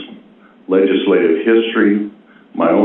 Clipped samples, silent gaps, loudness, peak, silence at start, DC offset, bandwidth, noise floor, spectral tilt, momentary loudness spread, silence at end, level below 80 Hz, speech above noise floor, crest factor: under 0.1%; none; -14 LUFS; -2 dBFS; 0 s; under 0.1%; 4 kHz; -45 dBFS; -10 dB/octave; 15 LU; 0 s; -62 dBFS; 32 dB; 12 dB